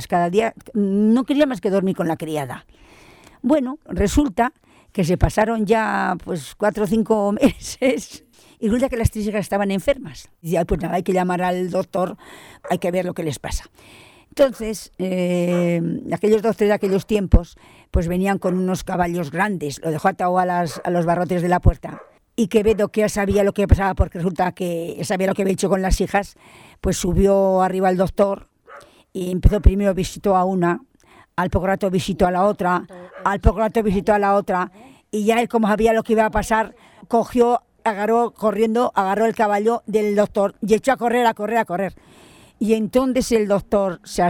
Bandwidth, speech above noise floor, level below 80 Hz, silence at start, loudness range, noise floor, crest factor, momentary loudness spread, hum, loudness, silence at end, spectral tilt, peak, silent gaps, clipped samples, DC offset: 18 kHz; 32 dB; -30 dBFS; 0 s; 3 LU; -51 dBFS; 20 dB; 9 LU; none; -20 LUFS; 0 s; -6.5 dB/octave; 0 dBFS; none; under 0.1%; under 0.1%